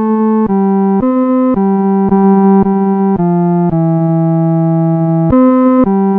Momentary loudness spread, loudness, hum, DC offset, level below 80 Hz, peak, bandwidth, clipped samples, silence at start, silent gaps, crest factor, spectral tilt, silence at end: 3 LU; -10 LUFS; none; under 0.1%; -38 dBFS; 0 dBFS; 3.2 kHz; under 0.1%; 0 s; none; 10 dB; -13 dB/octave; 0 s